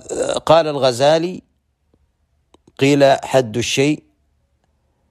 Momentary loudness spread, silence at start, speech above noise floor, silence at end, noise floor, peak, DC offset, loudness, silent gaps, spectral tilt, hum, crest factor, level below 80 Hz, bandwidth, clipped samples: 9 LU; 0.1 s; 49 dB; 1.15 s; -64 dBFS; 0 dBFS; under 0.1%; -16 LUFS; none; -4.5 dB/octave; none; 18 dB; -54 dBFS; 14.5 kHz; under 0.1%